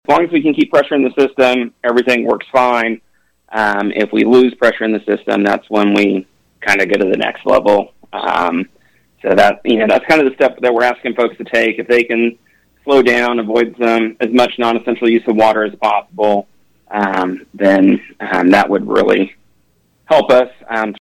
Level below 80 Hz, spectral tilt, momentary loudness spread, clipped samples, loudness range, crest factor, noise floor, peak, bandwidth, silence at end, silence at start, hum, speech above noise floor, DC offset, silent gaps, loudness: -54 dBFS; -5.5 dB/octave; 8 LU; under 0.1%; 1 LU; 12 dB; -58 dBFS; 0 dBFS; 15.5 kHz; 0.15 s; 0.1 s; none; 45 dB; under 0.1%; none; -13 LUFS